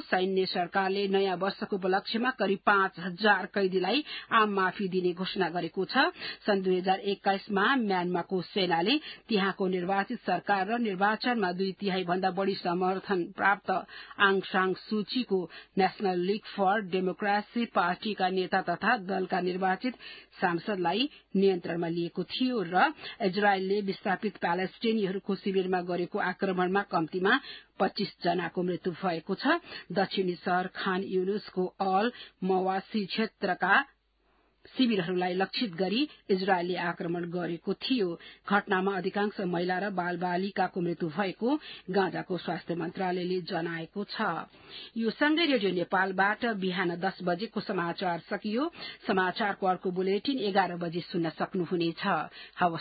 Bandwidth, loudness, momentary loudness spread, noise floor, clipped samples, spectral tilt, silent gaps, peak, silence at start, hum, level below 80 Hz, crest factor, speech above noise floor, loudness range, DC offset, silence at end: 5 kHz; -29 LUFS; 7 LU; -70 dBFS; under 0.1%; -9.5 dB/octave; none; -8 dBFS; 0 s; none; -72 dBFS; 20 dB; 40 dB; 3 LU; under 0.1%; 0 s